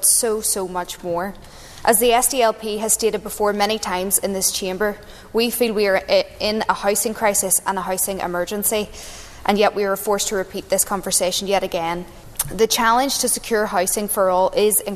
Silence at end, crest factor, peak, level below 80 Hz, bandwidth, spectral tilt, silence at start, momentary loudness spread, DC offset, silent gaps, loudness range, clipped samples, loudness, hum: 0 s; 18 dB; -2 dBFS; -44 dBFS; 14 kHz; -2 dB/octave; 0 s; 10 LU; under 0.1%; none; 2 LU; under 0.1%; -19 LUFS; none